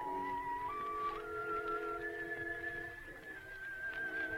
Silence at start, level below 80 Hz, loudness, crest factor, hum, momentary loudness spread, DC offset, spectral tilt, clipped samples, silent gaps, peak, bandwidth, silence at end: 0 s; -62 dBFS; -41 LUFS; 12 dB; none; 8 LU; under 0.1%; -5 dB/octave; under 0.1%; none; -30 dBFS; 16 kHz; 0 s